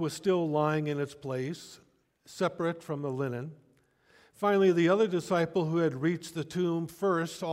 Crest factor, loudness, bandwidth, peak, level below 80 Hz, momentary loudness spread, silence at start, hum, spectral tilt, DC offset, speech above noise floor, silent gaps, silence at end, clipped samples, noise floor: 16 dB; -30 LUFS; 16 kHz; -14 dBFS; -72 dBFS; 11 LU; 0 s; none; -6.5 dB/octave; under 0.1%; 37 dB; none; 0 s; under 0.1%; -66 dBFS